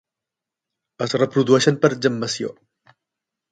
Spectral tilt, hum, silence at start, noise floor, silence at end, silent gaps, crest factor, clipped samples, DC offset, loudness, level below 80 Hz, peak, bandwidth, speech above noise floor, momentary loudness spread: -5 dB/octave; none; 1 s; -86 dBFS; 1 s; none; 22 dB; under 0.1%; under 0.1%; -19 LUFS; -64 dBFS; 0 dBFS; 9.4 kHz; 67 dB; 12 LU